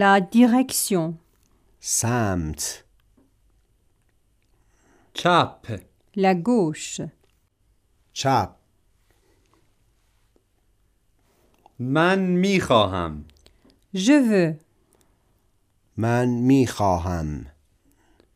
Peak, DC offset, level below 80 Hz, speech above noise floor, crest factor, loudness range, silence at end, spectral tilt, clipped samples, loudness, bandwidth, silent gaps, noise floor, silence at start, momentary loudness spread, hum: -2 dBFS; under 0.1%; -48 dBFS; 44 dB; 22 dB; 9 LU; 0.85 s; -5 dB/octave; under 0.1%; -21 LUFS; 15.5 kHz; none; -65 dBFS; 0 s; 19 LU; none